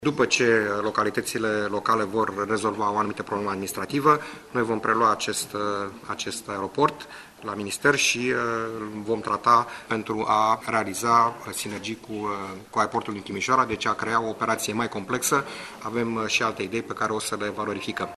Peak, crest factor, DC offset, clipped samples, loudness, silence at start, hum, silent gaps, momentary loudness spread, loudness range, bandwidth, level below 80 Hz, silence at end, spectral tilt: -6 dBFS; 20 dB; under 0.1%; under 0.1%; -25 LUFS; 0 s; none; none; 10 LU; 3 LU; 13 kHz; -60 dBFS; 0 s; -3.5 dB/octave